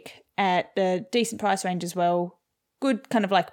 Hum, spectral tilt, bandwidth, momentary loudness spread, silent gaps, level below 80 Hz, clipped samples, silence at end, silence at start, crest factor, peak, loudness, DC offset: none; -4.5 dB/octave; 18.5 kHz; 5 LU; none; -78 dBFS; under 0.1%; 0 s; 0.05 s; 18 dB; -8 dBFS; -26 LUFS; under 0.1%